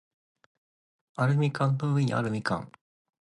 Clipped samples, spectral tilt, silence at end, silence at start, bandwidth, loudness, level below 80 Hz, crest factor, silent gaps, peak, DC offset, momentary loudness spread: under 0.1%; -7.5 dB/octave; 0.55 s; 1.2 s; 10.5 kHz; -28 LUFS; -64 dBFS; 18 dB; none; -12 dBFS; under 0.1%; 11 LU